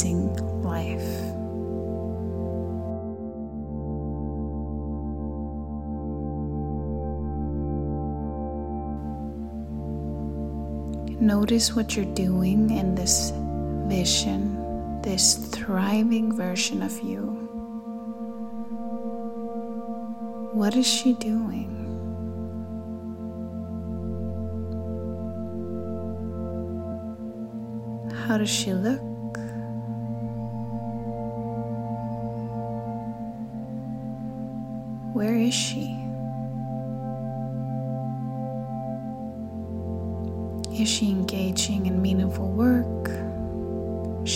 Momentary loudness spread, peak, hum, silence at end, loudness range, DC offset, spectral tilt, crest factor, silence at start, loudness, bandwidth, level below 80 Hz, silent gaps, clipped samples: 12 LU; -4 dBFS; none; 0 s; 9 LU; under 0.1%; -4.5 dB/octave; 22 dB; 0 s; -28 LUFS; 16 kHz; -40 dBFS; none; under 0.1%